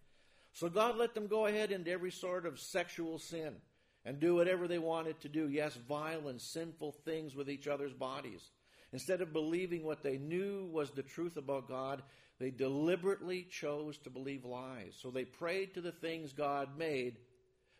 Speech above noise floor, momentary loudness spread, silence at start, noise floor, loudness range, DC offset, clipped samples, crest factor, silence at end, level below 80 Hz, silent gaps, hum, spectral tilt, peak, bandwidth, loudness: 33 dB; 12 LU; 0.55 s; -72 dBFS; 4 LU; under 0.1%; under 0.1%; 20 dB; 0.55 s; -78 dBFS; none; none; -5.5 dB/octave; -18 dBFS; 15.5 kHz; -40 LUFS